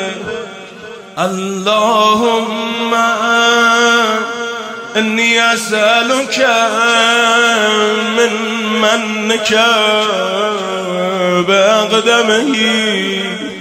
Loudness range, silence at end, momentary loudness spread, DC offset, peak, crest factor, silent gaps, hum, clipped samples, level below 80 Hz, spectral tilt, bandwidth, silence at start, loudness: 2 LU; 0 s; 10 LU; under 0.1%; 0 dBFS; 12 dB; none; none; under 0.1%; -58 dBFS; -2.5 dB/octave; 16 kHz; 0 s; -12 LUFS